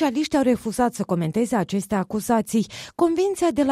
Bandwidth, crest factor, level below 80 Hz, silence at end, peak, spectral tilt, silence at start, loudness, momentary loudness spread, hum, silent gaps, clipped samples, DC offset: 15.5 kHz; 14 dB; -54 dBFS; 0 s; -8 dBFS; -5.5 dB/octave; 0 s; -23 LUFS; 4 LU; none; none; under 0.1%; under 0.1%